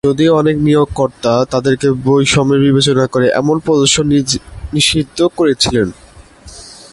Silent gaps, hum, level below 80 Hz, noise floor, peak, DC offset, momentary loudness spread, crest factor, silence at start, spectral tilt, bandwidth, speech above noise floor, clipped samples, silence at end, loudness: none; none; -36 dBFS; -37 dBFS; 0 dBFS; under 0.1%; 6 LU; 12 dB; 0.05 s; -4.5 dB/octave; 11.5 kHz; 25 dB; under 0.1%; 0.2 s; -12 LUFS